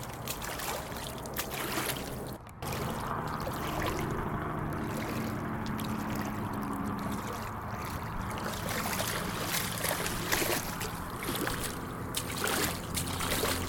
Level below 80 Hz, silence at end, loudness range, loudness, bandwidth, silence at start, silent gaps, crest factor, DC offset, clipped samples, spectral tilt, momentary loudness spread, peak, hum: -48 dBFS; 0 s; 3 LU; -34 LUFS; 17.5 kHz; 0 s; none; 22 dB; under 0.1%; under 0.1%; -3.5 dB/octave; 7 LU; -12 dBFS; none